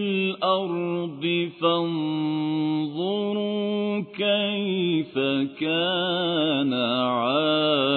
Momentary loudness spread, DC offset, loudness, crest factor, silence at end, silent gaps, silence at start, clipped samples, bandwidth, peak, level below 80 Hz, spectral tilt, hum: 4 LU; under 0.1%; -24 LUFS; 14 dB; 0 s; none; 0 s; under 0.1%; 4.5 kHz; -10 dBFS; -74 dBFS; -8.5 dB/octave; none